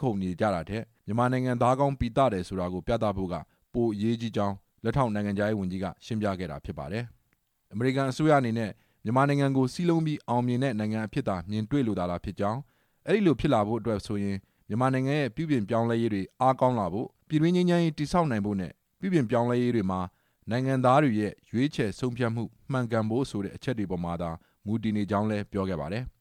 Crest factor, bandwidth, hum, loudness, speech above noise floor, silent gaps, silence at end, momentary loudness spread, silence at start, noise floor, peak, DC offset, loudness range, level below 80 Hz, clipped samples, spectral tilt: 18 dB; 13 kHz; none; -28 LUFS; 45 dB; none; 0.1 s; 11 LU; 0 s; -72 dBFS; -10 dBFS; under 0.1%; 4 LU; -52 dBFS; under 0.1%; -7.5 dB/octave